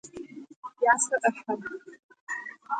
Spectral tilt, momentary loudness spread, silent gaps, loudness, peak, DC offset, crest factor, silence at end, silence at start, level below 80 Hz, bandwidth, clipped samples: -2.5 dB/octave; 22 LU; 0.56-0.62 s, 2.03-2.09 s, 2.21-2.27 s; -27 LUFS; -6 dBFS; under 0.1%; 24 dB; 0 s; 0.05 s; -74 dBFS; 9.6 kHz; under 0.1%